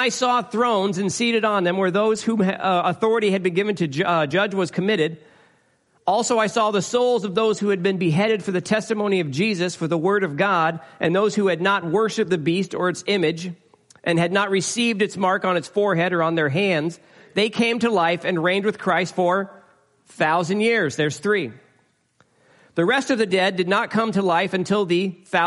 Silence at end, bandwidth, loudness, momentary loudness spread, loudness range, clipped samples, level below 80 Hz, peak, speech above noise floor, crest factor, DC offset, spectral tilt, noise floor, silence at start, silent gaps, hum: 0 s; 11.5 kHz; -21 LUFS; 4 LU; 2 LU; under 0.1%; -68 dBFS; -6 dBFS; 42 dB; 14 dB; under 0.1%; -5 dB/octave; -63 dBFS; 0 s; none; none